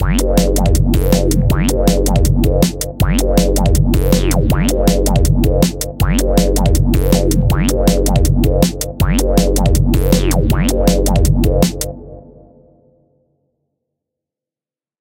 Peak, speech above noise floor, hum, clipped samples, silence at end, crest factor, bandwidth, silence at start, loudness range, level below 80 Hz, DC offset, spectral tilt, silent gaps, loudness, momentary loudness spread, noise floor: 0 dBFS; over 78 dB; none; under 0.1%; 2.8 s; 14 dB; 17 kHz; 0 s; 4 LU; -16 dBFS; under 0.1%; -6 dB/octave; none; -14 LUFS; 3 LU; under -90 dBFS